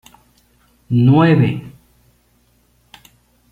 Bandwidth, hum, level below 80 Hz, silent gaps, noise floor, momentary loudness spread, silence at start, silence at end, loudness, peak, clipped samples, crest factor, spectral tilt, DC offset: 6.4 kHz; none; -52 dBFS; none; -58 dBFS; 10 LU; 0.9 s; 1.85 s; -14 LUFS; -2 dBFS; under 0.1%; 16 dB; -9 dB/octave; under 0.1%